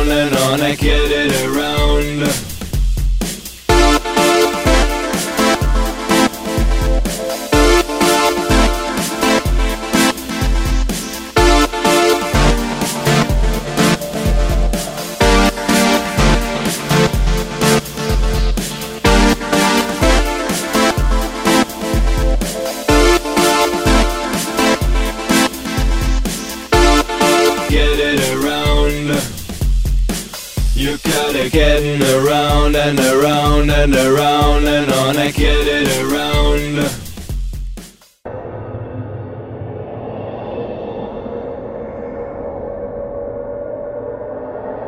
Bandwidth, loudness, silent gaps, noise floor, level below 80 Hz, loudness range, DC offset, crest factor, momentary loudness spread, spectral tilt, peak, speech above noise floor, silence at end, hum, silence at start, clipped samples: 16.5 kHz; -15 LUFS; none; -36 dBFS; -20 dBFS; 12 LU; under 0.1%; 14 dB; 14 LU; -4.5 dB/octave; 0 dBFS; 22 dB; 0 s; none; 0 s; under 0.1%